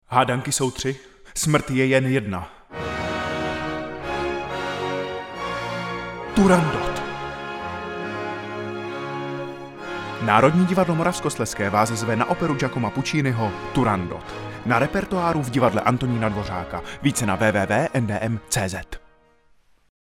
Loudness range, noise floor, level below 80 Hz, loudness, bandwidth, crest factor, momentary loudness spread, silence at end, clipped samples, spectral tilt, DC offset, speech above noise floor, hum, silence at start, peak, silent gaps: 6 LU; -57 dBFS; -46 dBFS; -23 LUFS; 16.5 kHz; 22 dB; 12 LU; 1.05 s; under 0.1%; -5 dB/octave; under 0.1%; 36 dB; none; 0.1 s; 0 dBFS; none